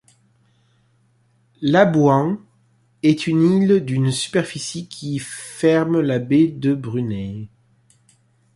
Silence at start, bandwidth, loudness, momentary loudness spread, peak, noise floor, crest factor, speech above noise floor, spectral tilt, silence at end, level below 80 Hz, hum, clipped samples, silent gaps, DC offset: 1.6 s; 11.5 kHz; -19 LUFS; 14 LU; -2 dBFS; -60 dBFS; 18 dB; 42 dB; -6.5 dB/octave; 1.1 s; -56 dBFS; none; under 0.1%; none; under 0.1%